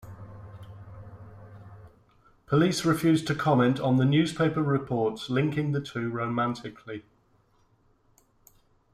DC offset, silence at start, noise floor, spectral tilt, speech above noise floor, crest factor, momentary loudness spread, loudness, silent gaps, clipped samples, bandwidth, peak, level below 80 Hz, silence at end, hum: under 0.1%; 0.05 s; -65 dBFS; -6.5 dB/octave; 39 dB; 18 dB; 23 LU; -26 LUFS; none; under 0.1%; 15 kHz; -10 dBFS; -60 dBFS; 1.95 s; none